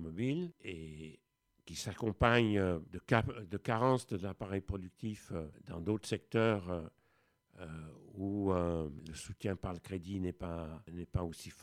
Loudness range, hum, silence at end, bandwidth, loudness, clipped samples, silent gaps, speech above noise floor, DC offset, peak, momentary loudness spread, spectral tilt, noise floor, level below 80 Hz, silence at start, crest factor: 6 LU; none; 0 s; 14.5 kHz; -37 LUFS; under 0.1%; none; 41 dB; under 0.1%; -12 dBFS; 15 LU; -6.5 dB/octave; -77 dBFS; -54 dBFS; 0 s; 26 dB